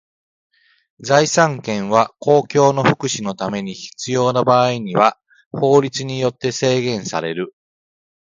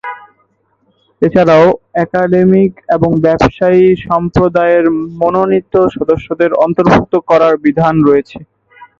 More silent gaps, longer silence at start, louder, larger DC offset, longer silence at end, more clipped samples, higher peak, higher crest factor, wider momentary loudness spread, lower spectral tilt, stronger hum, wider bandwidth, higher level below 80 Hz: first, 5.46-5.51 s vs none; first, 1 s vs 0.05 s; second, -17 LUFS vs -10 LUFS; neither; first, 0.9 s vs 0.55 s; neither; about the same, 0 dBFS vs 0 dBFS; first, 18 dB vs 10 dB; first, 11 LU vs 6 LU; second, -4.5 dB/octave vs -8.5 dB/octave; neither; first, 9.4 kHz vs 7.2 kHz; second, -58 dBFS vs -38 dBFS